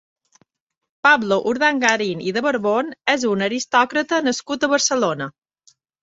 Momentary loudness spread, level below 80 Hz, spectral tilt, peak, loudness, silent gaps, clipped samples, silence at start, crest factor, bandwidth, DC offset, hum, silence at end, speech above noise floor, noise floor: 6 LU; -66 dBFS; -3 dB/octave; -2 dBFS; -19 LUFS; none; under 0.1%; 1.05 s; 18 dB; 8 kHz; under 0.1%; none; 0.75 s; 41 dB; -60 dBFS